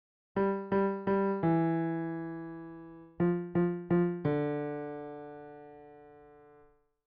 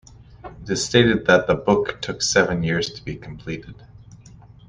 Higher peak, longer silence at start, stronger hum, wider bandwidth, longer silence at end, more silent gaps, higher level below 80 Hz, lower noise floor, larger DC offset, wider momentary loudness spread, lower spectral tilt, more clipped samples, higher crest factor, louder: second, -18 dBFS vs -2 dBFS; first, 0.35 s vs 0.2 s; neither; second, 4.8 kHz vs 10 kHz; second, 0.8 s vs 0.95 s; neither; second, -66 dBFS vs -46 dBFS; first, -63 dBFS vs -45 dBFS; neither; about the same, 19 LU vs 17 LU; first, -8.5 dB/octave vs -4 dB/octave; neither; about the same, 16 dB vs 20 dB; second, -32 LUFS vs -19 LUFS